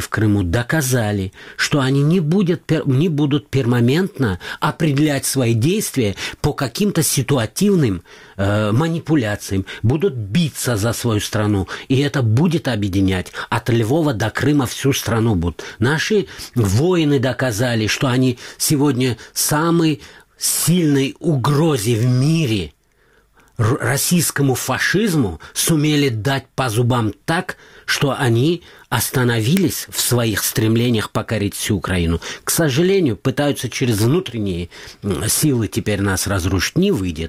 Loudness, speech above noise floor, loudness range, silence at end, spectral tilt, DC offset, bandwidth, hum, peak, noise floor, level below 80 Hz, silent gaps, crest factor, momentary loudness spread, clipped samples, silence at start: -18 LUFS; 39 dB; 2 LU; 0 s; -5 dB/octave; 0.2%; 16 kHz; none; 0 dBFS; -56 dBFS; -42 dBFS; none; 16 dB; 6 LU; under 0.1%; 0 s